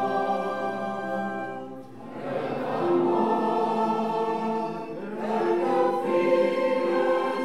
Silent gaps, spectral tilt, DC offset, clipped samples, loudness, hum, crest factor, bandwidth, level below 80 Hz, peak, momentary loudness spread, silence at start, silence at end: none; -6.5 dB/octave; 0.4%; under 0.1%; -26 LUFS; none; 14 dB; 12 kHz; -74 dBFS; -10 dBFS; 12 LU; 0 s; 0 s